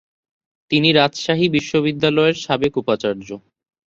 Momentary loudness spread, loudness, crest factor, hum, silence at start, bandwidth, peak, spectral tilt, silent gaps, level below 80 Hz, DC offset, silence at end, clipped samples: 10 LU; -18 LUFS; 18 dB; none; 0.7 s; 7.8 kHz; -2 dBFS; -5.5 dB/octave; none; -54 dBFS; under 0.1%; 0.5 s; under 0.1%